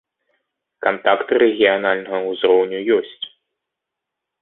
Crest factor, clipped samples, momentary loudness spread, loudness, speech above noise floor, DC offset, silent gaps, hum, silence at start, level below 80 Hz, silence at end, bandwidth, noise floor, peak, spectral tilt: 18 dB; under 0.1%; 11 LU; -18 LUFS; 65 dB; under 0.1%; none; none; 0.8 s; -64 dBFS; 1.15 s; 4.1 kHz; -82 dBFS; 0 dBFS; -9 dB/octave